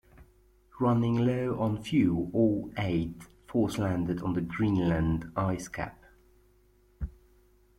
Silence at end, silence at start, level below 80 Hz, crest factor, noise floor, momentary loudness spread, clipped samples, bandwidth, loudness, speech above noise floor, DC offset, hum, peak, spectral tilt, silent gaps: 0.7 s; 0.2 s; -48 dBFS; 16 dB; -63 dBFS; 13 LU; under 0.1%; 15.5 kHz; -29 LUFS; 35 dB; under 0.1%; none; -14 dBFS; -7.5 dB/octave; none